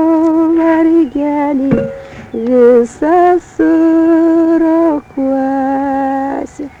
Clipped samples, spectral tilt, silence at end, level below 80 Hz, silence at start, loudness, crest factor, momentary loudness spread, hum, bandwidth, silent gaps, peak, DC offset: under 0.1%; -8 dB/octave; 0.1 s; -44 dBFS; 0 s; -11 LUFS; 10 dB; 9 LU; none; 8 kHz; none; 0 dBFS; under 0.1%